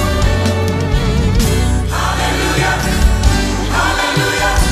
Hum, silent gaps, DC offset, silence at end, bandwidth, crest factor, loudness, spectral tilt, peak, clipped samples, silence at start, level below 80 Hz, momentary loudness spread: none; none; under 0.1%; 0 s; 15 kHz; 12 dB; -14 LUFS; -4.5 dB/octave; 0 dBFS; under 0.1%; 0 s; -18 dBFS; 2 LU